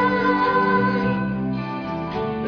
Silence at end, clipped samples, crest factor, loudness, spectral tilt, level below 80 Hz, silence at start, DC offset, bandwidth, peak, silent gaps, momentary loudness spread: 0 s; under 0.1%; 14 dB; -21 LUFS; -8.5 dB/octave; -46 dBFS; 0 s; under 0.1%; 5.4 kHz; -8 dBFS; none; 9 LU